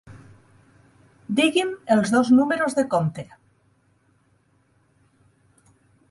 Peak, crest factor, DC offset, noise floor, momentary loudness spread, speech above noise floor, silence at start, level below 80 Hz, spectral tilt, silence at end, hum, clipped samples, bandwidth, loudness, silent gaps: -6 dBFS; 18 dB; under 0.1%; -63 dBFS; 11 LU; 43 dB; 0.1 s; -64 dBFS; -5.5 dB/octave; 2.9 s; none; under 0.1%; 11.5 kHz; -21 LUFS; none